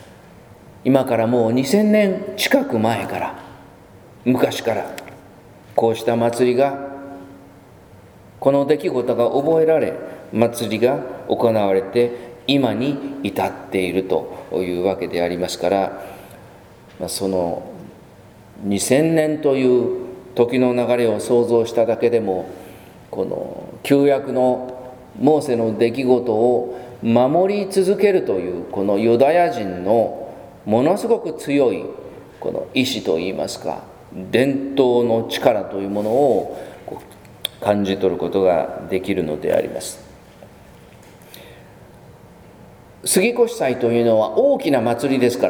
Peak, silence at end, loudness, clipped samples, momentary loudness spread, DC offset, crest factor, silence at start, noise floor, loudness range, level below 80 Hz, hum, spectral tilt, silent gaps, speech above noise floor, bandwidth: 0 dBFS; 0 s; -19 LUFS; under 0.1%; 14 LU; under 0.1%; 20 dB; 0 s; -44 dBFS; 5 LU; -56 dBFS; none; -5.5 dB/octave; none; 26 dB; over 20 kHz